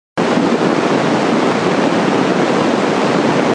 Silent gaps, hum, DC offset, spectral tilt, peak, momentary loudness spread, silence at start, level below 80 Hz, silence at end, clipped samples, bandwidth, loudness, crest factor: none; none; under 0.1%; -5.5 dB/octave; 0 dBFS; 1 LU; 0.15 s; -54 dBFS; 0 s; under 0.1%; 11 kHz; -14 LUFS; 14 dB